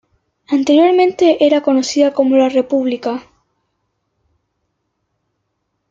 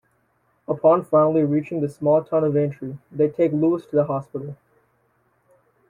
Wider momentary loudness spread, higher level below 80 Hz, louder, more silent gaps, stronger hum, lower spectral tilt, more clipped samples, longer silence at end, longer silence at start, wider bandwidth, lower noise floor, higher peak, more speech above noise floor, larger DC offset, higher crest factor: second, 9 LU vs 16 LU; about the same, -64 dBFS vs -64 dBFS; first, -13 LUFS vs -21 LUFS; neither; neither; second, -3.5 dB/octave vs -10.5 dB/octave; neither; first, 2.7 s vs 1.35 s; second, 0.5 s vs 0.7 s; second, 7.8 kHz vs 11 kHz; first, -71 dBFS vs -66 dBFS; first, -2 dBFS vs -6 dBFS; first, 58 dB vs 46 dB; neither; about the same, 14 dB vs 16 dB